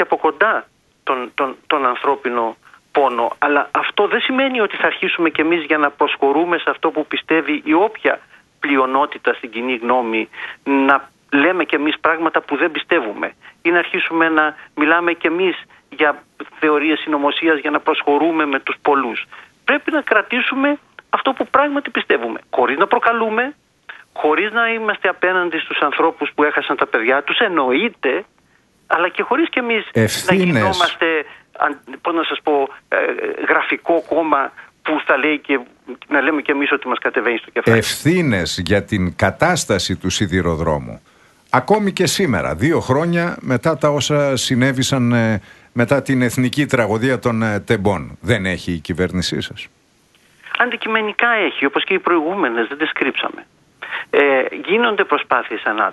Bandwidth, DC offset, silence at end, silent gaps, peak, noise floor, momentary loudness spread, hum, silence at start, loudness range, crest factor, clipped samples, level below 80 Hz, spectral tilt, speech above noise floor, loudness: 12 kHz; under 0.1%; 0 s; none; 0 dBFS; -56 dBFS; 7 LU; none; 0 s; 2 LU; 18 dB; under 0.1%; -48 dBFS; -5 dB/octave; 39 dB; -17 LUFS